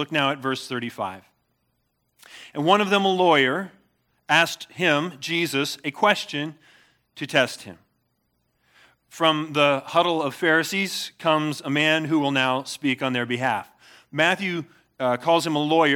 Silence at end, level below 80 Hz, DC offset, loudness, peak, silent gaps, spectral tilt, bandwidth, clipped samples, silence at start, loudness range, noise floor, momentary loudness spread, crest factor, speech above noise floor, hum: 0 s; -76 dBFS; under 0.1%; -22 LUFS; -4 dBFS; none; -4 dB/octave; 18.5 kHz; under 0.1%; 0 s; 4 LU; -72 dBFS; 10 LU; 20 dB; 49 dB; none